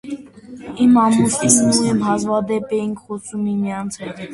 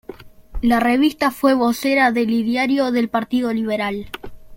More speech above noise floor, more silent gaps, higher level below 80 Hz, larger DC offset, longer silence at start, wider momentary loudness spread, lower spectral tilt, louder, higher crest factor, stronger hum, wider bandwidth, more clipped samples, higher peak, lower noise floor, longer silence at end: about the same, 20 dB vs 21 dB; neither; second, -54 dBFS vs -40 dBFS; neither; about the same, 0.05 s vs 0.1 s; first, 17 LU vs 9 LU; about the same, -4.5 dB/octave vs -5 dB/octave; about the same, -17 LUFS vs -18 LUFS; about the same, 18 dB vs 16 dB; neither; second, 12 kHz vs 17 kHz; neither; about the same, 0 dBFS vs -2 dBFS; about the same, -37 dBFS vs -39 dBFS; about the same, 0 s vs 0 s